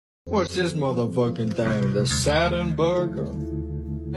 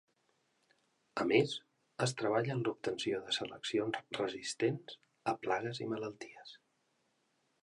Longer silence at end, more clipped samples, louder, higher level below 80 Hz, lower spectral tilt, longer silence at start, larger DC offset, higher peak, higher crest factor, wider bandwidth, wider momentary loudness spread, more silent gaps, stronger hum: second, 0 s vs 1.05 s; neither; first, -24 LUFS vs -36 LUFS; first, -38 dBFS vs -78 dBFS; about the same, -5.5 dB/octave vs -4.5 dB/octave; second, 0.25 s vs 1.15 s; neither; first, -8 dBFS vs -16 dBFS; second, 16 dB vs 22 dB; about the same, 12.5 kHz vs 11.5 kHz; second, 9 LU vs 16 LU; neither; neither